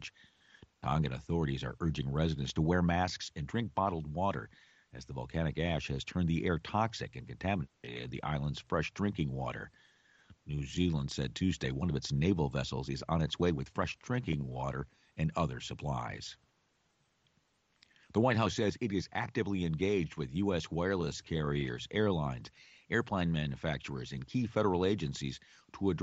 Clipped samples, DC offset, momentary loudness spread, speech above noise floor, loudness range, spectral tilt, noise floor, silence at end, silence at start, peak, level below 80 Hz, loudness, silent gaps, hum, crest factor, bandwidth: under 0.1%; under 0.1%; 11 LU; 41 dB; 4 LU; -6.5 dB/octave; -75 dBFS; 0 s; 0 s; -16 dBFS; -52 dBFS; -35 LUFS; none; none; 18 dB; 8 kHz